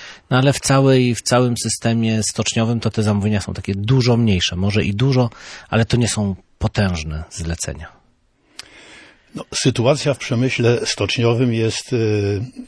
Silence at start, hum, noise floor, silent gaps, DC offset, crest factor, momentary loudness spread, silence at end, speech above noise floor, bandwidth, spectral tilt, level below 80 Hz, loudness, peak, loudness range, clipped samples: 0 s; none; -58 dBFS; none; under 0.1%; 16 dB; 10 LU; 0 s; 41 dB; 11 kHz; -5 dB/octave; -40 dBFS; -18 LUFS; -2 dBFS; 7 LU; under 0.1%